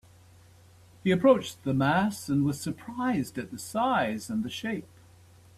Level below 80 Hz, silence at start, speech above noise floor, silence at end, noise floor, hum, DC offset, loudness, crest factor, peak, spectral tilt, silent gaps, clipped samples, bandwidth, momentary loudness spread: -62 dBFS; 1.05 s; 28 dB; 0.7 s; -55 dBFS; none; under 0.1%; -28 LUFS; 20 dB; -10 dBFS; -6 dB/octave; none; under 0.1%; 14.5 kHz; 12 LU